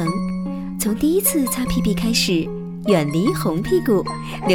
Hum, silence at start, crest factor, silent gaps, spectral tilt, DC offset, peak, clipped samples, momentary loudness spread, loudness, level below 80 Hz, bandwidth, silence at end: none; 0 s; 16 dB; none; -5 dB/octave; under 0.1%; -4 dBFS; under 0.1%; 9 LU; -20 LUFS; -38 dBFS; 18 kHz; 0 s